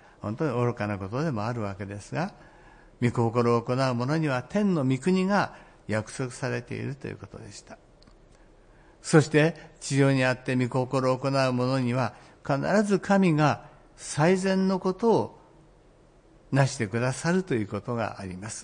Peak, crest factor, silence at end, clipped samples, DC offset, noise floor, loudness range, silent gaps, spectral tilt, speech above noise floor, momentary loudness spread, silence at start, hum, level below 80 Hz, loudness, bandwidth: -6 dBFS; 20 dB; 0 s; under 0.1%; under 0.1%; -56 dBFS; 6 LU; none; -6.5 dB/octave; 31 dB; 14 LU; 0.25 s; none; -58 dBFS; -26 LUFS; 10.5 kHz